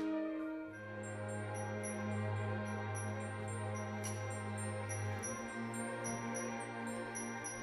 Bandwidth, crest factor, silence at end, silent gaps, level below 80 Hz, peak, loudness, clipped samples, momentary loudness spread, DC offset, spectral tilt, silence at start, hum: 13.5 kHz; 14 dB; 0 s; none; -72 dBFS; -28 dBFS; -42 LUFS; under 0.1%; 3 LU; under 0.1%; -5 dB/octave; 0 s; none